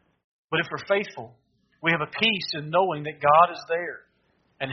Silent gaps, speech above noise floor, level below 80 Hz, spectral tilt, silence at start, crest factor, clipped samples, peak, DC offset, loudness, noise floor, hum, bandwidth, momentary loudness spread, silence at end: none; 43 dB; -68 dBFS; -2 dB/octave; 0.5 s; 22 dB; under 0.1%; -4 dBFS; under 0.1%; -24 LUFS; -68 dBFS; none; 6.4 kHz; 16 LU; 0 s